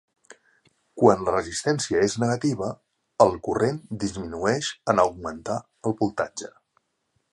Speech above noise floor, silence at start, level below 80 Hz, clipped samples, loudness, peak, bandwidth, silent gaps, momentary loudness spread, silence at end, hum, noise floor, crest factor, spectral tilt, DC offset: 50 dB; 0.95 s; -54 dBFS; under 0.1%; -24 LUFS; -2 dBFS; 11.5 kHz; none; 12 LU; 0.85 s; none; -73 dBFS; 22 dB; -5 dB/octave; under 0.1%